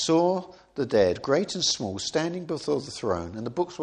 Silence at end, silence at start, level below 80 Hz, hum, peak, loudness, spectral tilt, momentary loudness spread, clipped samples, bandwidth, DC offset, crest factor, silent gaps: 0 s; 0 s; -58 dBFS; none; -8 dBFS; -27 LUFS; -4 dB/octave; 9 LU; under 0.1%; 10.5 kHz; under 0.1%; 18 dB; none